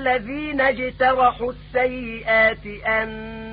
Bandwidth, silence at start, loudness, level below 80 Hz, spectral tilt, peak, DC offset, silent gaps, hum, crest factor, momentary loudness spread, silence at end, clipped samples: 5 kHz; 0 s; -21 LUFS; -42 dBFS; -9.5 dB/octave; -6 dBFS; under 0.1%; none; none; 16 dB; 11 LU; 0 s; under 0.1%